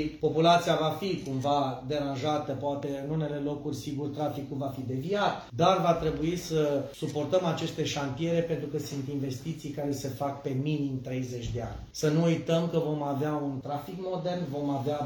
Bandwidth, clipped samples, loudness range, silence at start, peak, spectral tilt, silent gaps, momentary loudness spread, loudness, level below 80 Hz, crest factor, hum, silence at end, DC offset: 19 kHz; under 0.1%; 4 LU; 0 s; -10 dBFS; -6 dB/octave; none; 9 LU; -30 LUFS; -54 dBFS; 20 dB; none; 0 s; under 0.1%